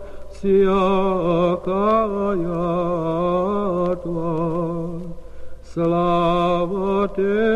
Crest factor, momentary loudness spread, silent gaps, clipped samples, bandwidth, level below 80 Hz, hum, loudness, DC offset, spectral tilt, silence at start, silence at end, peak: 14 dB; 8 LU; none; under 0.1%; 9.2 kHz; -40 dBFS; none; -20 LUFS; under 0.1%; -8.5 dB/octave; 0 s; 0 s; -6 dBFS